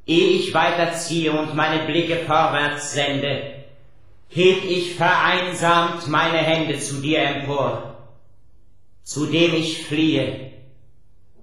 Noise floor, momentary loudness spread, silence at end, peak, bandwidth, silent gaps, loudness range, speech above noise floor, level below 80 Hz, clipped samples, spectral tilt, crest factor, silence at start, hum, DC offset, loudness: -57 dBFS; 8 LU; 0.9 s; -2 dBFS; 13 kHz; none; 4 LU; 37 dB; -56 dBFS; under 0.1%; -4.5 dB/octave; 18 dB; 0.1 s; none; 0.8%; -20 LUFS